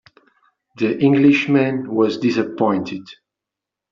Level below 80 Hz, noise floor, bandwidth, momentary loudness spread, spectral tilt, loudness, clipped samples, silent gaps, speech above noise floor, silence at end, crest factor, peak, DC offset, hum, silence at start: -64 dBFS; -85 dBFS; 7.2 kHz; 10 LU; -5.5 dB/octave; -17 LUFS; under 0.1%; none; 68 dB; 0.8 s; 16 dB; -4 dBFS; under 0.1%; none; 0.75 s